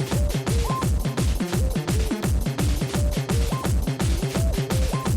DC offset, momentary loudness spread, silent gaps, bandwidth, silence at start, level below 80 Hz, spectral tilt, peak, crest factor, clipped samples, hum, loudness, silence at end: under 0.1%; 1 LU; none; 17 kHz; 0 s; -26 dBFS; -5.5 dB/octave; -10 dBFS; 12 dB; under 0.1%; none; -24 LUFS; 0 s